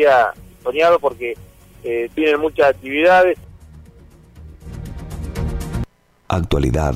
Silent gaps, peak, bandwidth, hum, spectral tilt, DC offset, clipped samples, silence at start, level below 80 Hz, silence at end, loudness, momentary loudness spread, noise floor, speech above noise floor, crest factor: none; -4 dBFS; 16 kHz; none; -6.5 dB/octave; under 0.1%; under 0.1%; 0 s; -32 dBFS; 0 s; -18 LUFS; 19 LU; -45 dBFS; 29 dB; 14 dB